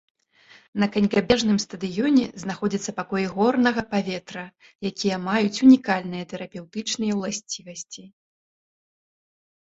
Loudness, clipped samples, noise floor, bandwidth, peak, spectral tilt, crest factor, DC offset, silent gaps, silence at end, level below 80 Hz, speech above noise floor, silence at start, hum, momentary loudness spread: -23 LUFS; under 0.1%; -54 dBFS; 8 kHz; -4 dBFS; -5 dB/octave; 20 dB; under 0.1%; 4.75-4.79 s; 1.65 s; -58 dBFS; 31 dB; 0.75 s; none; 16 LU